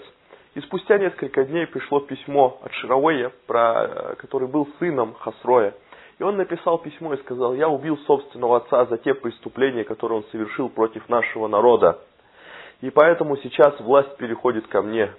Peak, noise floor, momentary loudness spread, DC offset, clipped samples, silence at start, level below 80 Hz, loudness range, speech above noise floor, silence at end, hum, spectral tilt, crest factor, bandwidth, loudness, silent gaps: 0 dBFS; -50 dBFS; 13 LU; under 0.1%; under 0.1%; 0 s; -66 dBFS; 4 LU; 30 dB; 0.05 s; none; -10 dB/octave; 22 dB; 4.1 kHz; -21 LUFS; none